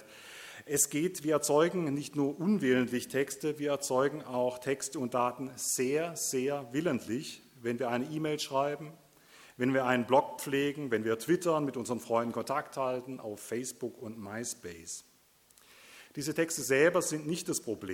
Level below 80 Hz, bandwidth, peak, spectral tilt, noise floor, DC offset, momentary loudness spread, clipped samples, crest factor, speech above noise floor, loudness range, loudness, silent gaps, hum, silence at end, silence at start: -74 dBFS; 18 kHz; -12 dBFS; -4 dB/octave; -64 dBFS; under 0.1%; 14 LU; under 0.1%; 20 dB; 32 dB; 7 LU; -32 LUFS; none; none; 0 s; 0 s